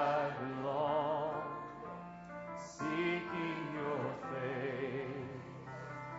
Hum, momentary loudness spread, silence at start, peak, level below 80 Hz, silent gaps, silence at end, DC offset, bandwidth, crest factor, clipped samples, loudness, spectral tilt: none; 13 LU; 0 s; -22 dBFS; -70 dBFS; none; 0 s; under 0.1%; 7.6 kHz; 18 dB; under 0.1%; -39 LUFS; -5 dB/octave